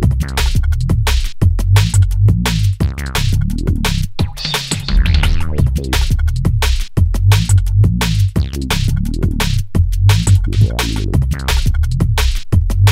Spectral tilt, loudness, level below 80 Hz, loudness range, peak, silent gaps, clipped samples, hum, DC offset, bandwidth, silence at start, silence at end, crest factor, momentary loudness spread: -5 dB/octave; -15 LUFS; -16 dBFS; 2 LU; 0 dBFS; none; under 0.1%; none; under 0.1%; 16 kHz; 0 s; 0 s; 12 dB; 5 LU